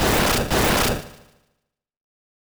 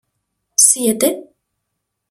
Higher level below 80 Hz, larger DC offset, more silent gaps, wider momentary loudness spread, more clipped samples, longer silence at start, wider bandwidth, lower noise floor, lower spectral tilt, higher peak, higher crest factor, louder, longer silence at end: first, -34 dBFS vs -68 dBFS; neither; neither; second, 6 LU vs 10 LU; neither; second, 0 s vs 0.6 s; about the same, over 20 kHz vs over 20 kHz; about the same, -77 dBFS vs -76 dBFS; first, -3.5 dB/octave vs -1.5 dB/octave; second, -10 dBFS vs 0 dBFS; second, 14 dB vs 20 dB; second, -20 LUFS vs -13 LUFS; first, 1.4 s vs 0.85 s